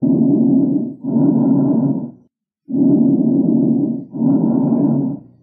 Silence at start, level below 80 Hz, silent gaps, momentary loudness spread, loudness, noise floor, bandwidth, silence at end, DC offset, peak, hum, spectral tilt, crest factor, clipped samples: 0 s; -62 dBFS; none; 8 LU; -16 LUFS; -57 dBFS; 1.5 kHz; 0.25 s; under 0.1%; -2 dBFS; none; -17 dB/octave; 12 dB; under 0.1%